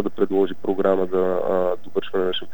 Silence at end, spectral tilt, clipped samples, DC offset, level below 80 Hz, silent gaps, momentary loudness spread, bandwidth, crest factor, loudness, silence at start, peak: 0.1 s; -7.5 dB/octave; under 0.1%; 5%; -66 dBFS; none; 4 LU; 18 kHz; 16 dB; -22 LUFS; 0 s; -6 dBFS